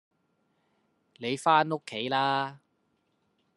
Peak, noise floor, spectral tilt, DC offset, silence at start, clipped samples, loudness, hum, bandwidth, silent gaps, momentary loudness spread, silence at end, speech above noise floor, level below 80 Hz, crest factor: -8 dBFS; -74 dBFS; -4.5 dB/octave; under 0.1%; 1.2 s; under 0.1%; -28 LUFS; none; 11.5 kHz; none; 12 LU; 1 s; 46 dB; -80 dBFS; 24 dB